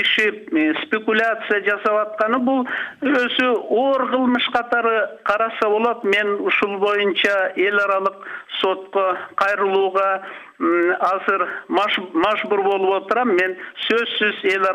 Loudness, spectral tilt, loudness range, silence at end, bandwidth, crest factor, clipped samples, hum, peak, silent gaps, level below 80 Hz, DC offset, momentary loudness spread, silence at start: -19 LUFS; -4.5 dB/octave; 1 LU; 0 s; 11.5 kHz; 14 dB; under 0.1%; none; -6 dBFS; none; -66 dBFS; under 0.1%; 4 LU; 0 s